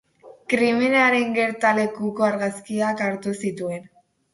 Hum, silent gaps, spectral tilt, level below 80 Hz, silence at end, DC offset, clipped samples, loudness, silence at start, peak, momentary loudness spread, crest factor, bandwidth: none; none; -5 dB/octave; -66 dBFS; 0.5 s; under 0.1%; under 0.1%; -21 LUFS; 0.25 s; -4 dBFS; 12 LU; 18 dB; 11.5 kHz